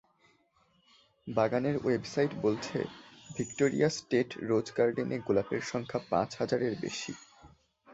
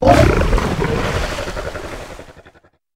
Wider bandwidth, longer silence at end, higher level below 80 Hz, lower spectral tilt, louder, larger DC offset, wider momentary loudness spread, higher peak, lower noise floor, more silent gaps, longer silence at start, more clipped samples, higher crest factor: second, 8 kHz vs 16 kHz; second, 0 s vs 0.45 s; second, -66 dBFS vs -24 dBFS; about the same, -5.5 dB/octave vs -6 dB/octave; second, -32 LUFS vs -18 LUFS; second, under 0.1% vs 0.9%; second, 10 LU vs 19 LU; second, -12 dBFS vs 0 dBFS; first, -70 dBFS vs -49 dBFS; neither; first, 1.25 s vs 0 s; neither; about the same, 20 dB vs 18 dB